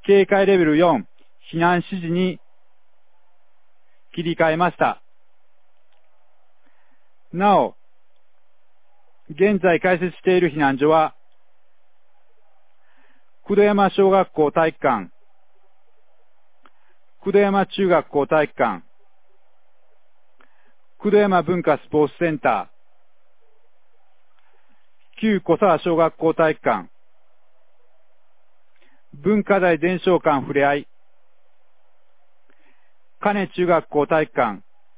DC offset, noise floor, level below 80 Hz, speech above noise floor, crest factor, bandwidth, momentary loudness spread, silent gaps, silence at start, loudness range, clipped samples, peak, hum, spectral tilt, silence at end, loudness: 0.8%; -69 dBFS; -60 dBFS; 50 dB; 20 dB; 4 kHz; 10 LU; none; 0.05 s; 5 LU; under 0.1%; -2 dBFS; none; -10.5 dB/octave; 0.4 s; -19 LUFS